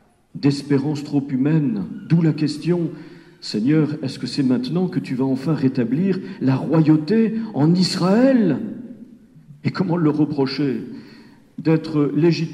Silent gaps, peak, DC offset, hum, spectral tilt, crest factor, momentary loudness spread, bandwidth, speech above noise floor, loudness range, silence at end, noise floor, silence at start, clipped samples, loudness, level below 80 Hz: none; -2 dBFS; under 0.1%; none; -7.5 dB/octave; 18 dB; 12 LU; 11.5 kHz; 27 dB; 4 LU; 0 s; -46 dBFS; 0.35 s; under 0.1%; -20 LUFS; -64 dBFS